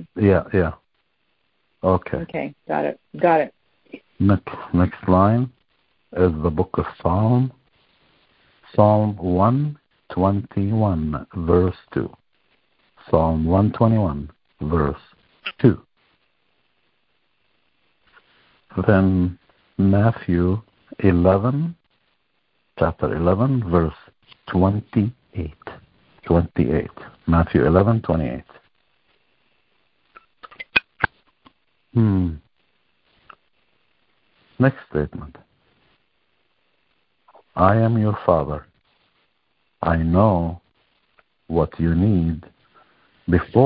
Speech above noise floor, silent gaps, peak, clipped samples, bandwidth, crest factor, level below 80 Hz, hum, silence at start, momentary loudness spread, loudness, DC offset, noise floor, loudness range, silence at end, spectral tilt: 51 dB; none; -2 dBFS; under 0.1%; 5 kHz; 20 dB; -36 dBFS; none; 0 s; 15 LU; -20 LUFS; under 0.1%; -70 dBFS; 7 LU; 0 s; -13 dB/octave